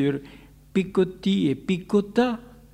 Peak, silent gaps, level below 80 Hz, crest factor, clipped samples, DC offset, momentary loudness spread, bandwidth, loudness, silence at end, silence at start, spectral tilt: -8 dBFS; none; -54 dBFS; 16 dB; under 0.1%; under 0.1%; 5 LU; 11 kHz; -24 LUFS; 0.3 s; 0 s; -7 dB/octave